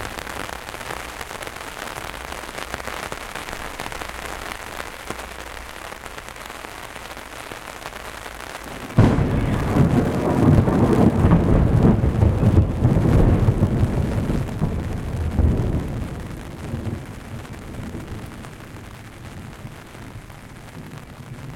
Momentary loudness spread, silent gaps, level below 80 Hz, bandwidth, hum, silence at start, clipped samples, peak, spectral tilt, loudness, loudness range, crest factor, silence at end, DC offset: 21 LU; none; -30 dBFS; 16.5 kHz; none; 0 s; under 0.1%; -2 dBFS; -7 dB/octave; -21 LUFS; 17 LU; 20 dB; 0 s; under 0.1%